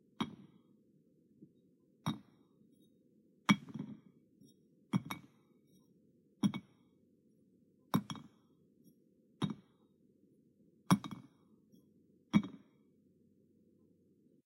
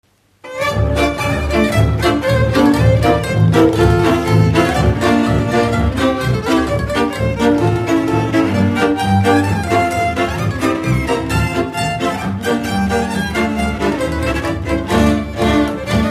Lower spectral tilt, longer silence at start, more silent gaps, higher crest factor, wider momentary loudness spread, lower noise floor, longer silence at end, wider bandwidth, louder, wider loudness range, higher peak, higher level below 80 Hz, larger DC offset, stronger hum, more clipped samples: about the same, -5.5 dB/octave vs -6.5 dB/octave; second, 0.2 s vs 0.45 s; neither; first, 28 dB vs 14 dB; first, 16 LU vs 6 LU; first, -70 dBFS vs -37 dBFS; first, 1.9 s vs 0 s; about the same, 16 kHz vs 15 kHz; second, -39 LUFS vs -15 LUFS; about the same, 5 LU vs 4 LU; second, -14 dBFS vs 0 dBFS; second, -80 dBFS vs -26 dBFS; neither; neither; neither